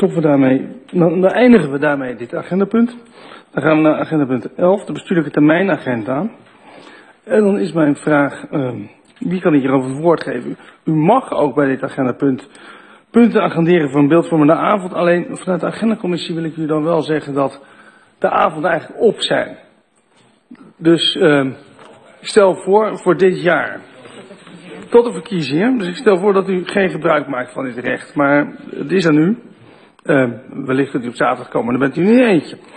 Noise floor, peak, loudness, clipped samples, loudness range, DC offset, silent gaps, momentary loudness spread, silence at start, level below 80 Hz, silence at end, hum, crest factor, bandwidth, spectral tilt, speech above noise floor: -55 dBFS; 0 dBFS; -15 LUFS; under 0.1%; 3 LU; under 0.1%; none; 10 LU; 0 s; -58 dBFS; 0.2 s; none; 16 dB; 9.6 kHz; -6.5 dB/octave; 40 dB